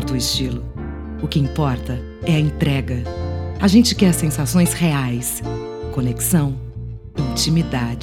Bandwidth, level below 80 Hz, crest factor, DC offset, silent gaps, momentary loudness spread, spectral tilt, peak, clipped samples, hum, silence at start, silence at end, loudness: 17.5 kHz; -32 dBFS; 18 dB; under 0.1%; none; 13 LU; -5 dB/octave; -2 dBFS; under 0.1%; none; 0 s; 0 s; -19 LUFS